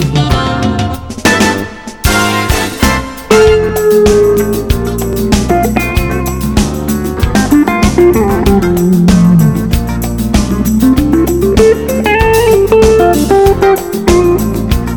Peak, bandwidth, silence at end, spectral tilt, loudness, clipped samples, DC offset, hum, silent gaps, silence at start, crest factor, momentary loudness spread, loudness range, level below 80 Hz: 0 dBFS; over 20 kHz; 0 s; -5.5 dB/octave; -10 LUFS; 1%; 0.6%; none; none; 0 s; 10 dB; 7 LU; 3 LU; -20 dBFS